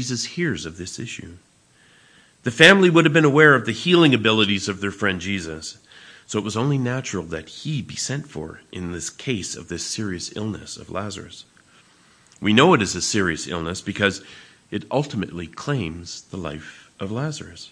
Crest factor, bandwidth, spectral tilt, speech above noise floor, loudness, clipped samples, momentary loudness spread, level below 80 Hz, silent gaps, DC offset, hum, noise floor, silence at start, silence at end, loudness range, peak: 22 dB; 11 kHz; -4.5 dB/octave; 34 dB; -20 LUFS; under 0.1%; 19 LU; -54 dBFS; none; under 0.1%; none; -56 dBFS; 0 s; 0.05 s; 13 LU; 0 dBFS